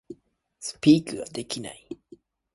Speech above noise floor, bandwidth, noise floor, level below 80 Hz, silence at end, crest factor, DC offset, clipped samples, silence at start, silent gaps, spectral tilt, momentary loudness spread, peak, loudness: 35 dB; 11.5 kHz; -59 dBFS; -64 dBFS; 0.6 s; 22 dB; under 0.1%; under 0.1%; 0.1 s; none; -5 dB/octave; 23 LU; -6 dBFS; -24 LUFS